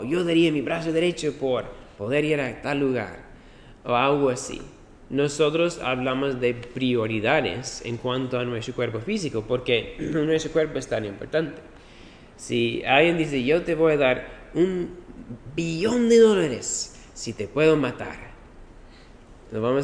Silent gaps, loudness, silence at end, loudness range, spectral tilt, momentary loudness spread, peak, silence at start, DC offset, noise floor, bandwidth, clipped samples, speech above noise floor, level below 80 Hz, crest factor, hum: none; -24 LUFS; 0 s; 4 LU; -5 dB/octave; 15 LU; -4 dBFS; 0 s; under 0.1%; -47 dBFS; 10.5 kHz; under 0.1%; 24 dB; -50 dBFS; 20 dB; none